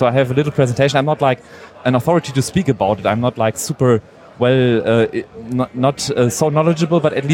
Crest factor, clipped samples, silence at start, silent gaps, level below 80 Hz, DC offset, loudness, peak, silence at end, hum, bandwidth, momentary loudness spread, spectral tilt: 14 dB; under 0.1%; 0 s; none; -50 dBFS; under 0.1%; -16 LUFS; -2 dBFS; 0 s; none; 16.5 kHz; 5 LU; -6 dB/octave